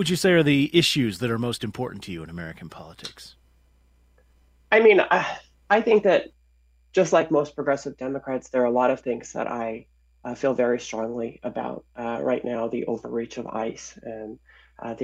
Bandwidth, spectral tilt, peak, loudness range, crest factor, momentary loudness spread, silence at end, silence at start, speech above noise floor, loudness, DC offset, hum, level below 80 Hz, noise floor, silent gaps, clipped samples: 16 kHz; -5 dB/octave; -4 dBFS; 9 LU; 20 dB; 19 LU; 0 s; 0 s; 36 dB; -23 LUFS; under 0.1%; none; -58 dBFS; -60 dBFS; none; under 0.1%